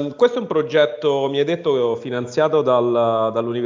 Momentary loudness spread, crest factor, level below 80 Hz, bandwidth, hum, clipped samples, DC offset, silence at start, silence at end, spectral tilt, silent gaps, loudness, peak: 5 LU; 16 dB; -66 dBFS; 7.6 kHz; none; under 0.1%; under 0.1%; 0 s; 0 s; -6 dB/octave; none; -19 LUFS; -2 dBFS